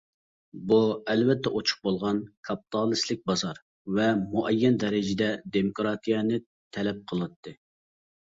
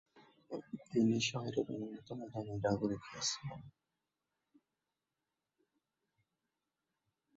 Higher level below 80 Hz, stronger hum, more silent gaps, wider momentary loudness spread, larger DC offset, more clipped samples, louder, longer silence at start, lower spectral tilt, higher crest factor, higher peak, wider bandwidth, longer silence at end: first, -62 dBFS vs -70 dBFS; neither; first, 2.37-2.43 s, 3.62-3.85 s, 6.46-6.71 s, 7.36-7.43 s vs none; second, 12 LU vs 15 LU; neither; neither; first, -27 LUFS vs -38 LUFS; first, 0.55 s vs 0.15 s; about the same, -5.5 dB/octave vs -5 dB/octave; about the same, 18 dB vs 20 dB; first, -10 dBFS vs -22 dBFS; about the same, 7.8 kHz vs 7.6 kHz; second, 0.85 s vs 3.65 s